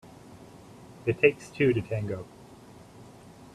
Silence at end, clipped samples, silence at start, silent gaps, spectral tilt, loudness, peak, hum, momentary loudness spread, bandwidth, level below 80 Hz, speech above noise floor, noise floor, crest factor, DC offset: 0.5 s; under 0.1%; 0.3 s; none; -7 dB/octave; -27 LUFS; -6 dBFS; none; 26 LU; 13 kHz; -60 dBFS; 24 dB; -50 dBFS; 24 dB; under 0.1%